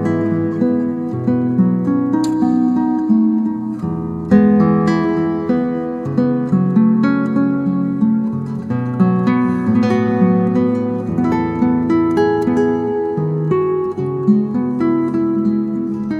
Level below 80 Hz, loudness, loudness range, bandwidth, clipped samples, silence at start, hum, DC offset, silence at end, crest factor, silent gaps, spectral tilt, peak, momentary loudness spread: -48 dBFS; -16 LUFS; 1 LU; 7.8 kHz; under 0.1%; 0 s; none; under 0.1%; 0 s; 14 dB; none; -9.5 dB/octave; 0 dBFS; 7 LU